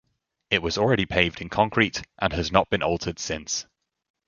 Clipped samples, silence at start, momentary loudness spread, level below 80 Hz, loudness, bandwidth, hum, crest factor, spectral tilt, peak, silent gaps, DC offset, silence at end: under 0.1%; 0.5 s; 8 LU; -44 dBFS; -24 LUFS; 7.4 kHz; none; 24 dB; -4 dB/octave; -2 dBFS; none; under 0.1%; 0.65 s